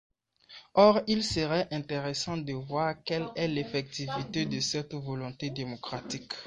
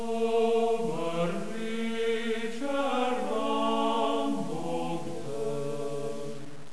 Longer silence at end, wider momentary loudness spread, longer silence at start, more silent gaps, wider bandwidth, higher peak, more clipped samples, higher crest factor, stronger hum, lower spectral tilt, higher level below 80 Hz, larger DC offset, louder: about the same, 0 s vs 0 s; first, 14 LU vs 9 LU; first, 0.5 s vs 0 s; neither; about the same, 11 kHz vs 11 kHz; first, -8 dBFS vs -14 dBFS; neither; first, 22 dB vs 14 dB; neither; about the same, -5 dB/octave vs -5.5 dB/octave; first, -60 dBFS vs -68 dBFS; second, under 0.1% vs 2%; about the same, -30 LUFS vs -30 LUFS